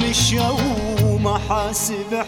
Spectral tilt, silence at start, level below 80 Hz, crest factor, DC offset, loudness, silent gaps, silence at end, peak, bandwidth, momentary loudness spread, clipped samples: -4 dB/octave; 0 s; -32 dBFS; 14 dB; under 0.1%; -19 LUFS; none; 0 s; -6 dBFS; 18.5 kHz; 5 LU; under 0.1%